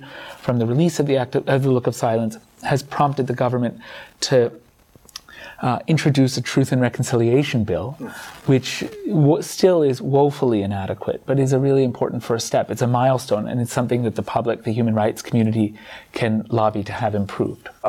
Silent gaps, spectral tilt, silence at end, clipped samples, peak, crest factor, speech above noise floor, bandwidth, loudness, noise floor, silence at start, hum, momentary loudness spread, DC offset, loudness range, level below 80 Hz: none; -6.5 dB/octave; 0 s; under 0.1%; -4 dBFS; 16 dB; 32 dB; 16 kHz; -20 LUFS; -51 dBFS; 0 s; none; 9 LU; under 0.1%; 3 LU; -56 dBFS